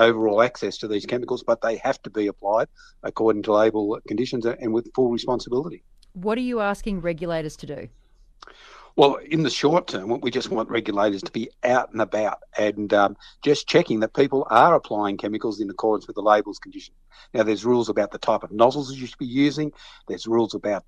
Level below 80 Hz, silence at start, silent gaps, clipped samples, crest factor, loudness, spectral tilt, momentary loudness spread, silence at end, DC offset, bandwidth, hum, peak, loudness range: -52 dBFS; 0 s; none; under 0.1%; 20 dB; -23 LUFS; -5.5 dB/octave; 12 LU; 0.05 s; under 0.1%; 10.5 kHz; none; -2 dBFS; 5 LU